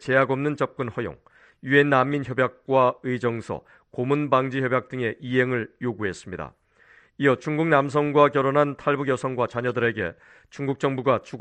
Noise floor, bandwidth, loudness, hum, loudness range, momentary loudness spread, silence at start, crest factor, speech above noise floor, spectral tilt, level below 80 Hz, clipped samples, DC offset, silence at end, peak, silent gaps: -56 dBFS; 9.2 kHz; -23 LUFS; none; 3 LU; 13 LU; 0 s; 20 dB; 33 dB; -7 dB/octave; -60 dBFS; under 0.1%; under 0.1%; 0 s; -4 dBFS; none